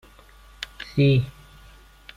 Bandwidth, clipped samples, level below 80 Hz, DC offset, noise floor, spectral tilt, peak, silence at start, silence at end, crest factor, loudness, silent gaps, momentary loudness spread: 11 kHz; under 0.1%; -48 dBFS; under 0.1%; -50 dBFS; -7.5 dB/octave; -10 dBFS; 0.6 s; 0.85 s; 16 dB; -22 LUFS; none; 18 LU